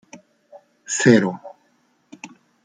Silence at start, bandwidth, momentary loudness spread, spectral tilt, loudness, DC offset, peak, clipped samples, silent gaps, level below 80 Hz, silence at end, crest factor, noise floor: 0.15 s; 9.6 kHz; 26 LU; -5 dB/octave; -18 LUFS; under 0.1%; -2 dBFS; under 0.1%; none; -64 dBFS; 0.4 s; 22 dB; -63 dBFS